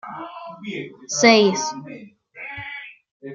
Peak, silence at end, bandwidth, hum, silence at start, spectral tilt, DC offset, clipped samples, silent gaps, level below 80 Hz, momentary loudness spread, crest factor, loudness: -2 dBFS; 0 s; 7.6 kHz; none; 0.05 s; -3 dB/octave; under 0.1%; under 0.1%; 3.11-3.20 s; -66 dBFS; 26 LU; 22 dB; -18 LUFS